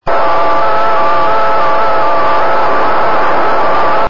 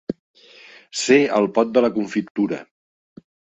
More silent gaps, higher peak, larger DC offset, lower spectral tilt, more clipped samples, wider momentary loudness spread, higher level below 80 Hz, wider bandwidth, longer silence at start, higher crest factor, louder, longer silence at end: second, none vs 0.19-0.34 s, 2.30-2.35 s; about the same, -2 dBFS vs -2 dBFS; first, 30% vs under 0.1%; about the same, -5.5 dB/octave vs -4.5 dB/octave; neither; second, 0 LU vs 16 LU; first, -40 dBFS vs -64 dBFS; second, 7.6 kHz vs 8.4 kHz; about the same, 0 s vs 0.1 s; second, 8 dB vs 20 dB; first, -11 LUFS vs -19 LUFS; second, 0 s vs 0.9 s